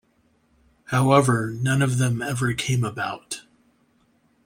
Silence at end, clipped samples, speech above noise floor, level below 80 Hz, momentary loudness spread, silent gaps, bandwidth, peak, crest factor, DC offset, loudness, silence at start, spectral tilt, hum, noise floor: 1.05 s; under 0.1%; 42 dB; -56 dBFS; 13 LU; none; 16 kHz; -2 dBFS; 22 dB; under 0.1%; -22 LUFS; 0.9 s; -5.5 dB/octave; none; -64 dBFS